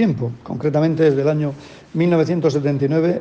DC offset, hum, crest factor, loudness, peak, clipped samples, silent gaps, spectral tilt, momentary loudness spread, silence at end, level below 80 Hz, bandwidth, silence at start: under 0.1%; none; 14 dB; -19 LUFS; -4 dBFS; under 0.1%; none; -8.5 dB/octave; 10 LU; 0 s; -56 dBFS; 7.6 kHz; 0 s